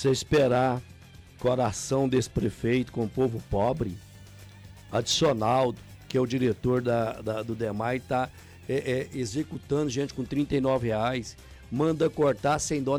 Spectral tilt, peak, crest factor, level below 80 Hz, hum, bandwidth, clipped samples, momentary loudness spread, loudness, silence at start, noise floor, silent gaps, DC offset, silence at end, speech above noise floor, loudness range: -5.5 dB/octave; -14 dBFS; 12 dB; -50 dBFS; none; 18 kHz; under 0.1%; 9 LU; -27 LUFS; 0 s; -49 dBFS; none; under 0.1%; 0 s; 22 dB; 3 LU